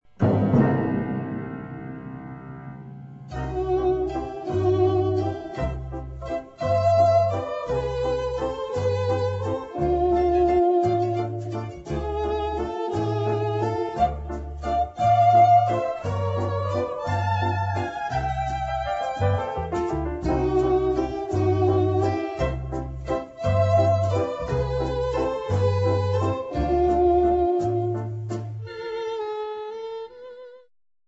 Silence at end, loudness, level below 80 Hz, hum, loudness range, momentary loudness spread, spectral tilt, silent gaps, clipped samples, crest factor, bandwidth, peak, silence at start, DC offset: 0.5 s; -24 LUFS; -38 dBFS; none; 5 LU; 14 LU; -8 dB/octave; none; under 0.1%; 16 dB; 8 kHz; -8 dBFS; 0.2 s; under 0.1%